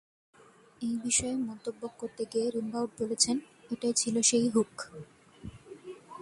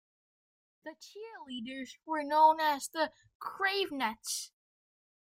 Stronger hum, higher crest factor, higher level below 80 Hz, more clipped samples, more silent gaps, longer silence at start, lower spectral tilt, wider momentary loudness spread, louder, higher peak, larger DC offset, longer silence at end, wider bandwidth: neither; about the same, 22 dB vs 22 dB; first, -64 dBFS vs -78 dBFS; neither; second, none vs 3.35-3.40 s; about the same, 0.8 s vs 0.85 s; first, -2.5 dB/octave vs -1 dB/octave; about the same, 22 LU vs 23 LU; about the same, -30 LUFS vs -31 LUFS; about the same, -12 dBFS vs -14 dBFS; neither; second, 0 s vs 0.8 s; second, 11.5 kHz vs 16 kHz